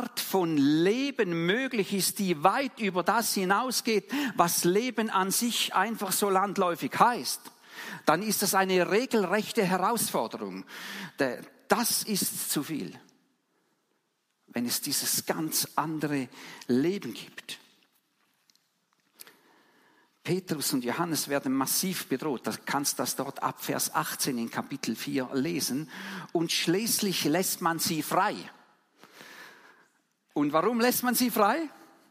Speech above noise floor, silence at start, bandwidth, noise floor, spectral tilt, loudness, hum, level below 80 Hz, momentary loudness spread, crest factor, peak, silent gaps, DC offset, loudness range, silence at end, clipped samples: 48 dB; 0 s; 15.5 kHz; -76 dBFS; -3.5 dB/octave; -28 LUFS; none; -78 dBFS; 14 LU; 24 dB; -6 dBFS; none; under 0.1%; 7 LU; 0.25 s; under 0.1%